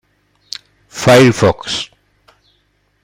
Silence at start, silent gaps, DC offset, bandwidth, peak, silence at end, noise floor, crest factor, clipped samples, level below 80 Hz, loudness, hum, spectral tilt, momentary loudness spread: 0.95 s; none; under 0.1%; 16 kHz; 0 dBFS; 1.2 s; -60 dBFS; 16 dB; under 0.1%; -48 dBFS; -12 LUFS; 50 Hz at -40 dBFS; -5 dB/octave; 22 LU